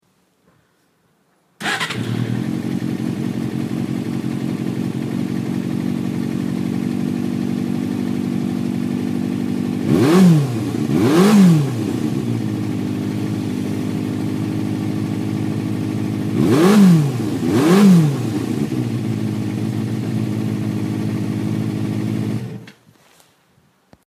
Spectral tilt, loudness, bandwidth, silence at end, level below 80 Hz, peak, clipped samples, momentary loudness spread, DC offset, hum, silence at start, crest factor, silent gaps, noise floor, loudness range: -7 dB/octave; -19 LUFS; 15.5 kHz; 1.35 s; -56 dBFS; -2 dBFS; under 0.1%; 11 LU; under 0.1%; none; 1.6 s; 16 dB; none; -61 dBFS; 8 LU